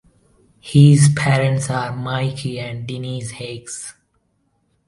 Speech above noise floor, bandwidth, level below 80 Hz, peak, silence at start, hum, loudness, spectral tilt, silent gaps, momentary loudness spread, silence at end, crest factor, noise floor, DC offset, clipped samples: 49 dB; 11.5 kHz; -52 dBFS; 0 dBFS; 0.65 s; none; -17 LUFS; -6 dB/octave; none; 19 LU; 0.95 s; 18 dB; -65 dBFS; under 0.1%; under 0.1%